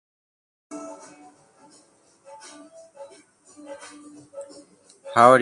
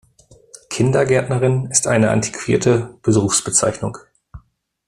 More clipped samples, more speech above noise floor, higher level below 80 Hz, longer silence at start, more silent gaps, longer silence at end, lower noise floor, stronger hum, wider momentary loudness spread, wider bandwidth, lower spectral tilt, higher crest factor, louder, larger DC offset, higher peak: neither; about the same, 37 dB vs 36 dB; second, -74 dBFS vs -48 dBFS; about the same, 0.7 s vs 0.7 s; neither; second, 0 s vs 0.5 s; first, -58 dBFS vs -53 dBFS; neither; first, 24 LU vs 6 LU; second, 11.5 kHz vs 14 kHz; about the same, -5 dB/octave vs -4.5 dB/octave; first, 26 dB vs 18 dB; second, -20 LUFS vs -17 LUFS; neither; about the same, 0 dBFS vs 0 dBFS